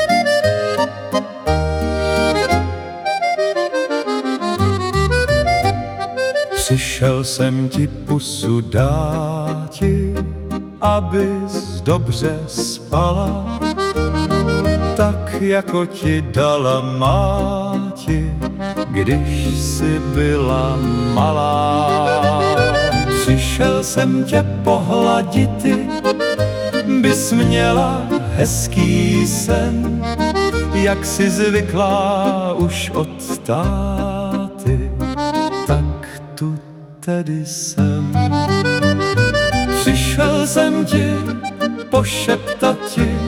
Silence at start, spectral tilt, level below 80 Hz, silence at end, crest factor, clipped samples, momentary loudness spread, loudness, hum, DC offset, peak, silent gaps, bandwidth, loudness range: 0 s; -5.5 dB/octave; -30 dBFS; 0 s; 14 dB; under 0.1%; 7 LU; -17 LUFS; none; under 0.1%; -2 dBFS; none; 18 kHz; 4 LU